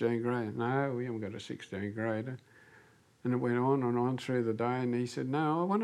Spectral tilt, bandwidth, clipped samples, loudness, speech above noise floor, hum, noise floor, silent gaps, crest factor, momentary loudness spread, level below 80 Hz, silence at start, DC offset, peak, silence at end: -7.5 dB/octave; 11.5 kHz; under 0.1%; -33 LUFS; 29 dB; none; -62 dBFS; none; 16 dB; 10 LU; -80 dBFS; 0 s; under 0.1%; -18 dBFS; 0 s